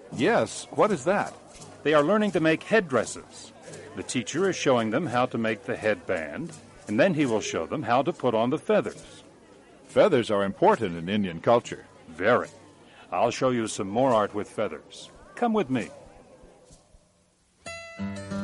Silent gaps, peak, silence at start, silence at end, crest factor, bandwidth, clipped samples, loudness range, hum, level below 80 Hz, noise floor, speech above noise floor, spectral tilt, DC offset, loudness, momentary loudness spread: none; -8 dBFS; 0 s; 0 s; 18 dB; 11.5 kHz; under 0.1%; 4 LU; none; -62 dBFS; -65 dBFS; 39 dB; -5 dB/octave; under 0.1%; -25 LUFS; 18 LU